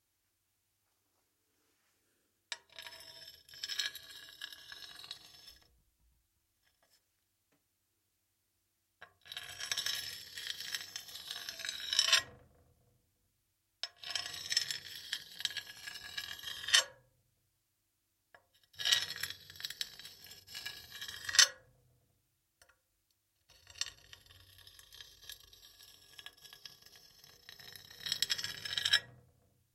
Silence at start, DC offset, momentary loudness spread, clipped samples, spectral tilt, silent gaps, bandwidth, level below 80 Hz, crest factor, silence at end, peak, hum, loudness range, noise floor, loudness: 2.5 s; under 0.1%; 26 LU; under 0.1%; 2 dB/octave; none; 16.5 kHz; -76 dBFS; 34 dB; 0.6 s; -8 dBFS; none; 18 LU; -81 dBFS; -35 LUFS